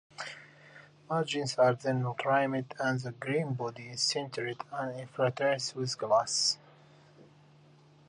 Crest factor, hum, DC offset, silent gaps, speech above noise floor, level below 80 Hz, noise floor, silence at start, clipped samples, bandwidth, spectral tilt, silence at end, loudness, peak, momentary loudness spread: 20 dB; none; under 0.1%; none; 28 dB; -76 dBFS; -59 dBFS; 0.2 s; under 0.1%; 11 kHz; -4 dB/octave; 0.85 s; -31 LUFS; -12 dBFS; 11 LU